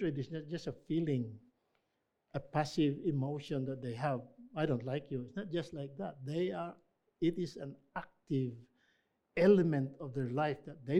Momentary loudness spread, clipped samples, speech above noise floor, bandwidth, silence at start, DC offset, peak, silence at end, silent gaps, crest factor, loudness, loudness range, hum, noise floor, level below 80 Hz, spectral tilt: 13 LU; under 0.1%; 47 dB; 11 kHz; 0 s; under 0.1%; -14 dBFS; 0 s; none; 22 dB; -37 LUFS; 5 LU; none; -83 dBFS; -66 dBFS; -8 dB/octave